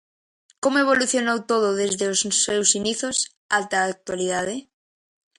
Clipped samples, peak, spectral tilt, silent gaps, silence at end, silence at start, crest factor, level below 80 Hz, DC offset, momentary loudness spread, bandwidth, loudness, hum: under 0.1%; -2 dBFS; -2 dB/octave; 3.37-3.49 s; 0.75 s; 0.65 s; 20 dB; -64 dBFS; under 0.1%; 8 LU; 11.5 kHz; -21 LUFS; none